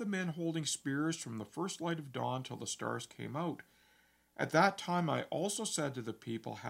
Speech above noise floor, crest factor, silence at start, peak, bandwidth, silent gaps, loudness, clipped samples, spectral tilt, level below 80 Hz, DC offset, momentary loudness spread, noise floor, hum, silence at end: 33 dB; 24 dB; 0 s; -14 dBFS; 16 kHz; none; -37 LUFS; under 0.1%; -4.5 dB/octave; -80 dBFS; under 0.1%; 12 LU; -70 dBFS; none; 0 s